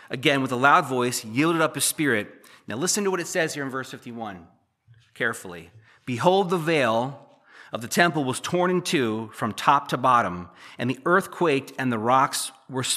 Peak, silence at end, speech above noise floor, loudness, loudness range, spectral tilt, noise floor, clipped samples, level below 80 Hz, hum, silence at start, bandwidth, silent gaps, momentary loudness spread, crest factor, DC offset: -2 dBFS; 0 s; 34 dB; -23 LUFS; 6 LU; -4 dB/octave; -58 dBFS; under 0.1%; -70 dBFS; none; 0.05 s; 15 kHz; none; 15 LU; 22 dB; under 0.1%